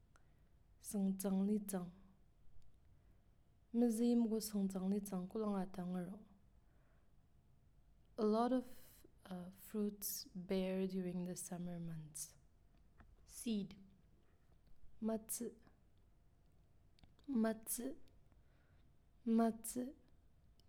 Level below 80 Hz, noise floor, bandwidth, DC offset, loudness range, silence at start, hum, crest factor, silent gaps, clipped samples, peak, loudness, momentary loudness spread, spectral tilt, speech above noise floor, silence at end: -70 dBFS; -70 dBFS; 18.5 kHz; under 0.1%; 8 LU; 0.15 s; none; 18 dB; none; under 0.1%; -26 dBFS; -42 LUFS; 15 LU; -6 dB/octave; 29 dB; 0.75 s